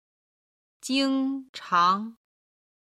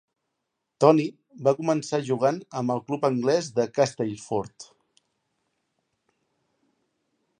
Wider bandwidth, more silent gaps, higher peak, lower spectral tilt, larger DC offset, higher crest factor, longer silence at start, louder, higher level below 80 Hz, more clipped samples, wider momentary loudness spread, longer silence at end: first, 13 kHz vs 10.5 kHz; first, 1.49-1.54 s vs none; second, -10 dBFS vs -4 dBFS; second, -3.5 dB/octave vs -6 dB/octave; neither; second, 18 dB vs 24 dB; about the same, 0.85 s vs 0.8 s; about the same, -25 LUFS vs -25 LUFS; about the same, -76 dBFS vs -72 dBFS; neither; first, 16 LU vs 11 LU; second, 0.85 s vs 2.75 s